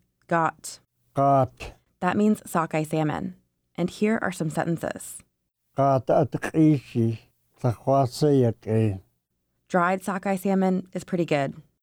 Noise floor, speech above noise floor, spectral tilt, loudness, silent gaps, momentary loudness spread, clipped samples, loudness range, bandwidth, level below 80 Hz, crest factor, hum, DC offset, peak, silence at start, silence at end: -75 dBFS; 52 dB; -7 dB/octave; -25 LUFS; none; 15 LU; under 0.1%; 3 LU; 18.5 kHz; -58 dBFS; 14 dB; none; under 0.1%; -10 dBFS; 0.3 s; 0.2 s